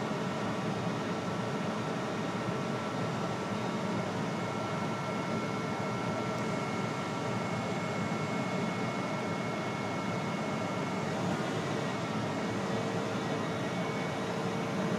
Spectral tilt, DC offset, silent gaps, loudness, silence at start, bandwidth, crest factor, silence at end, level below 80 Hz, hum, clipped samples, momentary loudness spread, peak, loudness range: -5.5 dB/octave; under 0.1%; none; -34 LUFS; 0 s; 14.5 kHz; 14 dB; 0 s; -66 dBFS; none; under 0.1%; 1 LU; -20 dBFS; 1 LU